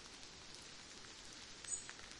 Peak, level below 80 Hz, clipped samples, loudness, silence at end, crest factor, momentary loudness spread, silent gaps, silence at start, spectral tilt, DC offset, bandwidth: -28 dBFS; -70 dBFS; under 0.1%; -50 LUFS; 0 s; 24 dB; 9 LU; none; 0 s; -0.5 dB/octave; under 0.1%; 11.5 kHz